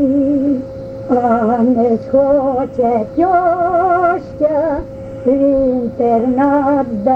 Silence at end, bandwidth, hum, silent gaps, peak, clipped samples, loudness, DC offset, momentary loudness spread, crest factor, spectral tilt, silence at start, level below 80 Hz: 0 s; 5.8 kHz; none; none; -2 dBFS; under 0.1%; -14 LUFS; under 0.1%; 6 LU; 12 dB; -9.5 dB/octave; 0 s; -40 dBFS